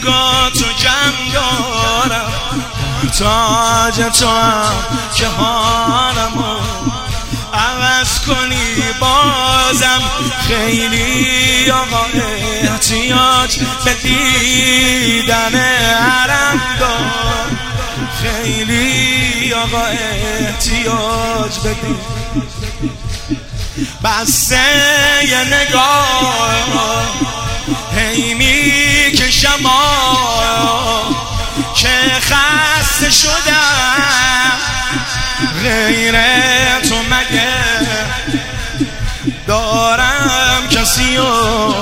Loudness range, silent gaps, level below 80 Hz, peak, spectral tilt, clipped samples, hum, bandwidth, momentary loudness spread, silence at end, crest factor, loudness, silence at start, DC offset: 4 LU; none; -26 dBFS; 0 dBFS; -2.5 dB/octave; under 0.1%; none; 16.5 kHz; 10 LU; 0 s; 14 dB; -12 LUFS; 0 s; under 0.1%